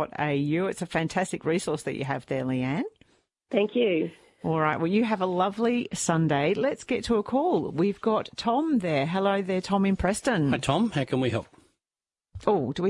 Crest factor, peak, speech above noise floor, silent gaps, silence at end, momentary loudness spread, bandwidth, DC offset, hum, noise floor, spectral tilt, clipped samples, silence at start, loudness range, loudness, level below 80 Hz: 18 dB; -8 dBFS; over 64 dB; none; 0 s; 6 LU; 11.5 kHz; under 0.1%; none; under -90 dBFS; -5.5 dB/octave; under 0.1%; 0 s; 3 LU; -26 LUFS; -54 dBFS